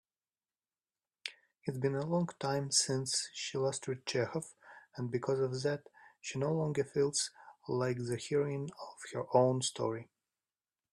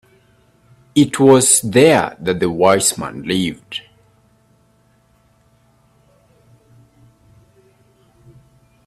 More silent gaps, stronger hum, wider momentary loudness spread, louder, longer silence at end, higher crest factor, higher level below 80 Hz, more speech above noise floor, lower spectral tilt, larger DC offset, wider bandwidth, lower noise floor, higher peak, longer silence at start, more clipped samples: neither; neither; about the same, 15 LU vs 15 LU; second, -35 LUFS vs -14 LUFS; second, 0.9 s vs 5.05 s; about the same, 22 dB vs 18 dB; second, -74 dBFS vs -54 dBFS; first, over 56 dB vs 42 dB; about the same, -4 dB/octave vs -4 dB/octave; neither; second, 13 kHz vs 15.5 kHz; first, under -90 dBFS vs -56 dBFS; second, -14 dBFS vs 0 dBFS; first, 1.25 s vs 0.95 s; neither